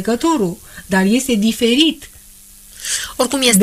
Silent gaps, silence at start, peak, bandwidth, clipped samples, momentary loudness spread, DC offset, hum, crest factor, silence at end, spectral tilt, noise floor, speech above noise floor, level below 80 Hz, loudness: none; 0 s; -2 dBFS; 15.5 kHz; under 0.1%; 11 LU; under 0.1%; none; 14 dB; 0 s; -3.5 dB/octave; -42 dBFS; 27 dB; -46 dBFS; -16 LUFS